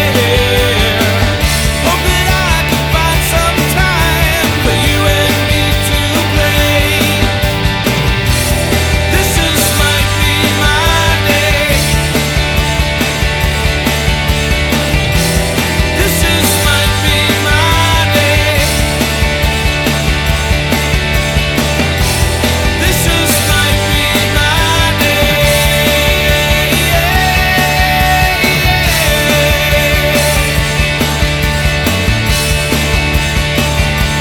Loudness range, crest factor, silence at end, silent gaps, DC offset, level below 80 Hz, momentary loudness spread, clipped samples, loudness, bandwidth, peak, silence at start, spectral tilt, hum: 2 LU; 10 dB; 0 s; none; under 0.1%; -18 dBFS; 3 LU; under 0.1%; -11 LUFS; over 20 kHz; 0 dBFS; 0 s; -4 dB/octave; none